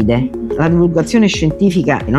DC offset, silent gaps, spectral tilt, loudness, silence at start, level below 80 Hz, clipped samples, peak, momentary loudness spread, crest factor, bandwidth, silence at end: under 0.1%; none; -6.5 dB/octave; -14 LUFS; 0 s; -32 dBFS; under 0.1%; 0 dBFS; 5 LU; 12 dB; 12.5 kHz; 0 s